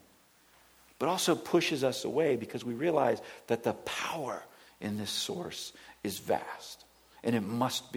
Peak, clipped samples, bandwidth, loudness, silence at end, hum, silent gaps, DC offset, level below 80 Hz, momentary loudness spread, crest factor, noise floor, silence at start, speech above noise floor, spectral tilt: -14 dBFS; under 0.1%; over 20 kHz; -32 LUFS; 0 s; none; none; under 0.1%; -72 dBFS; 13 LU; 20 dB; -63 dBFS; 1 s; 31 dB; -4 dB/octave